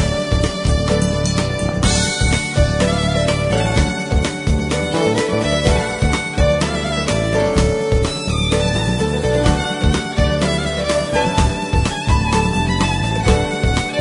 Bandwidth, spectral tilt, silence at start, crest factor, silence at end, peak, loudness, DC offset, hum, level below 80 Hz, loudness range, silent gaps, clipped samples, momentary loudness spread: 11 kHz; -5 dB/octave; 0 s; 16 dB; 0 s; 0 dBFS; -17 LUFS; under 0.1%; none; -24 dBFS; 1 LU; none; under 0.1%; 3 LU